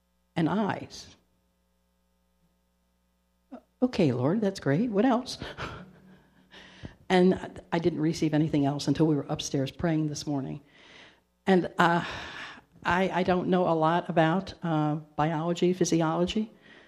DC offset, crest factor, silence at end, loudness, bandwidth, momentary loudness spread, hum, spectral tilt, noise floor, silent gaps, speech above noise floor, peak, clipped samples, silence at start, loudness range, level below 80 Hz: under 0.1%; 24 dB; 0.4 s; -27 LUFS; 12.5 kHz; 14 LU; 60 Hz at -55 dBFS; -6 dB/octave; -72 dBFS; none; 45 dB; -4 dBFS; under 0.1%; 0.35 s; 6 LU; -58 dBFS